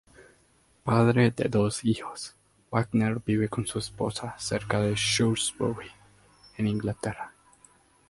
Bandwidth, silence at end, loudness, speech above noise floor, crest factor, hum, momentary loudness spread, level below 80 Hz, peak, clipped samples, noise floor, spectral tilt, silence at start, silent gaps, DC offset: 11.5 kHz; 0.8 s; -27 LUFS; 37 dB; 20 dB; none; 15 LU; -56 dBFS; -8 dBFS; under 0.1%; -64 dBFS; -5 dB/octave; 0.2 s; none; under 0.1%